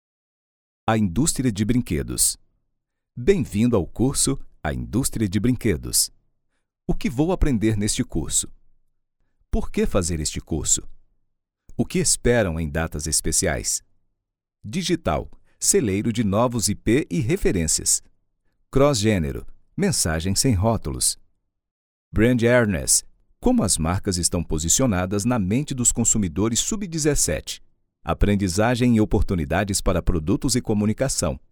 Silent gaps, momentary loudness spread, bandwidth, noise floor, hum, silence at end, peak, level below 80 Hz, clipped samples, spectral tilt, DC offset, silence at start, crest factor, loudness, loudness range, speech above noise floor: 21.71-22.11 s; 9 LU; over 20 kHz; -81 dBFS; none; 0.15 s; -4 dBFS; -34 dBFS; under 0.1%; -4 dB/octave; under 0.1%; 0.85 s; 18 dB; -22 LUFS; 4 LU; 60 dB